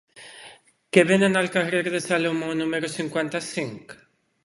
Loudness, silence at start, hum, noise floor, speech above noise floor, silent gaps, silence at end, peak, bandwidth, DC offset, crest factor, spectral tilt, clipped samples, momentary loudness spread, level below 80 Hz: -23 LUFS; 0.15 s; none; -50 dBFS; 27 dB; none; 0.5 s; 0 dBFS; 11.5 kHz; under 0.1%; 24 dB; -5 dB/octave; under 0.1%; 23 LU; -66 dBFS